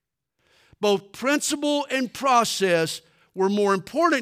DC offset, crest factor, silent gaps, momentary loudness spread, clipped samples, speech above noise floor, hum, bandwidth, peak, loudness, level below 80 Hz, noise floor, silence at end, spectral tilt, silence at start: under 0.1%; 16 dB; none; 7 LU; under 0.1%; 49 dB; none; 16 kHz; -8 dBFS; -23 LUFS; -70 dBFS; -71 dBFS; 0 s; -3.5 dB/octave; 0.8 s